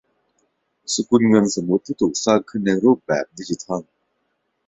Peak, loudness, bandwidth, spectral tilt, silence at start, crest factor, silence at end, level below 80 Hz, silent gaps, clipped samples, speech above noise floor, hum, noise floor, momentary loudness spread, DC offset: -2 dBFS; -20 LUFS; 8.4 kHz; -5 dB/octave; 0.9 s; 18 dB; 0.85 s; -58 dBFS; none; under 0.1%; 53 dB; none; -71 dBFS; 13 LU; under 0.1%